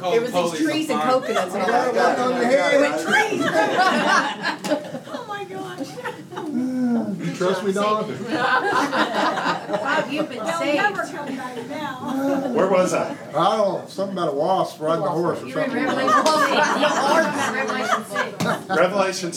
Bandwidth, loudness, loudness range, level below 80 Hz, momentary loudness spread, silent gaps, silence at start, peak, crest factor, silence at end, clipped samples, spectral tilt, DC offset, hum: 17 kHz; -21 LUFS; 5 LU; -76 dBFS; 12 LU; none; 0 s; -4 dBFS; 18 dB; 0 s; under 0.1%; -4 dB/octave; under 0.1%; none